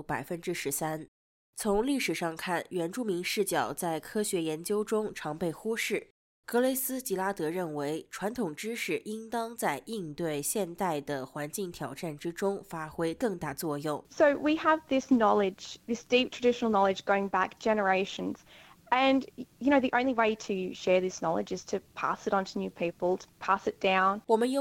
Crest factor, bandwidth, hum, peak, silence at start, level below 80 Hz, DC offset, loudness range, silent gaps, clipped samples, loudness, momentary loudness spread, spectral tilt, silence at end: 18 dB; 16.5 kHz; none; -12 dBFS; 0 s; -62 dBFS; under 0.1%; 6 LU; 1.08-1.53 s, 6.10-6.43 s; under 0.1%; -30 LUFS; 10 LU; -4 dB/octave; 0 s